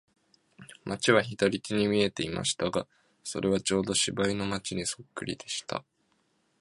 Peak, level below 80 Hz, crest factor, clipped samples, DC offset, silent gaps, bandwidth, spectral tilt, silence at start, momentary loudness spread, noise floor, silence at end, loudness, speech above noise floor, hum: -6 dBFS; -58 dBFS; 24 dB; under 0.1%; under 0.1%; none; 11.5 kHz; -3.5 dB/octave; 0.6 s; 13 LU; -72 dBFS; 0.8 s; -29 LUFS; 43 dB; none